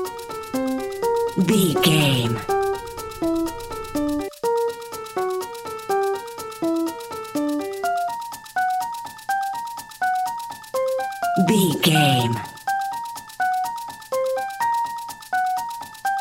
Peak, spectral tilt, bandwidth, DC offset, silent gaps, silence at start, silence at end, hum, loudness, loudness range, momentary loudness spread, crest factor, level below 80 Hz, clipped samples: -2 dBFS; -5 dB/octave; 17 kHz; under 0.1%; none; 0 s; 0 s; none; -23 LUFS; 5 LU; 13 LU; 20 dB; -50 dBFS; under 0.1%